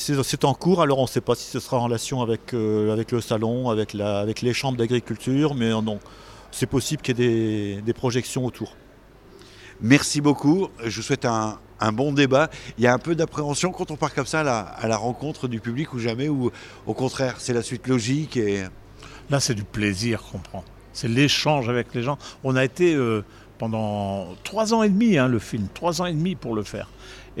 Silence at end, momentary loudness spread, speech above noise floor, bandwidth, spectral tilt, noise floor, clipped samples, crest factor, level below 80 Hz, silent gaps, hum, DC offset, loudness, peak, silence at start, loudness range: 0 s; 11 LU; 26 dB; 16 kHz; -5.5 dB/octave; -49 dBFS; under 0.1%; 22 dB; -50 dBFS; none; none; under 0.1%; -23 LUFS; -2 dBFS; 0 s; 4 LU